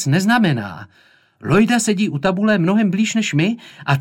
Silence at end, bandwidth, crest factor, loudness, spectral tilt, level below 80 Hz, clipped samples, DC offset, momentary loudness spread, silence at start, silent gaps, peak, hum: 0 s; 16.5 kHz; 14 dB; -17 LUFS; -5.5 dB/octave; -54 dBFS; under 0.1%; under 0.1%; 11 LU; 0 s; none; -4 dBFS; none